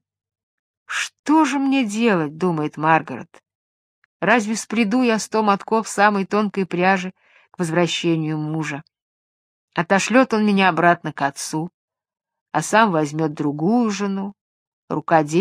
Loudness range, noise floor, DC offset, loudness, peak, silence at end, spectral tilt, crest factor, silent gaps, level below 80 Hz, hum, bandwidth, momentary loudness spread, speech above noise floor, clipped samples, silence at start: 3 LU; under -90 dBFS; under 0.1%; -20 LUFS; 0 dBFS; 0 s; -5 dB/octave; 20 dB; 1.19-1.24 s, 3.55-4.20 s, 9.02-9.68 s, 11.74-11.88 s, 12.41-12.46 s, 14.41-14.88 s; -70 dBFS; none; 14.5 kHz; 11 LU; over 71 dB; under 0.1%; 0.9 s